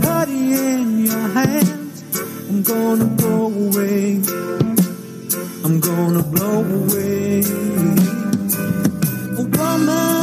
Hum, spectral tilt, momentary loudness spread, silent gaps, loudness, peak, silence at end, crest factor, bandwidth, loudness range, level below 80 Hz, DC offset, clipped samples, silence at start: none; -5.5 dB/octave; 6 LU; none; -18 LUFS; 0 dBFS; 0 s; 18 dB; 15.5 kHz; 1 LU; -52 dBFS; under 0.1%; under 0.1%; 0 s